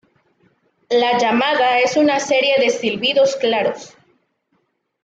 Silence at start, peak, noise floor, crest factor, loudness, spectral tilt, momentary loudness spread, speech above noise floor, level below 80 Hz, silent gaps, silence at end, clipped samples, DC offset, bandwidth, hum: 0.9 s; -4 dBFS; -67 dBFS; 14 dB; -16 LUFS; -3 dB/octave; 5 LU; 51 dB; -64 dBFS; none; 1.15 s; under 0.1%; under 0.1%; 8 kHz; none